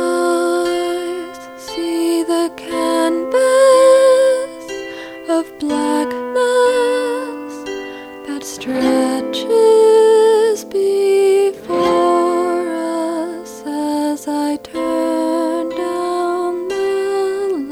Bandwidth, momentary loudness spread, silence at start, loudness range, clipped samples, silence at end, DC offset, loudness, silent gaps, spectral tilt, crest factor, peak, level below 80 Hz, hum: 16.5 kHz; 16 LU; 0 s; 6 LU; under 0.1%; 0 s; under 0.1%; -16 LUFS; none; -3 dB/octave; 16 dB; 0 dBFS; -56 dBFS; none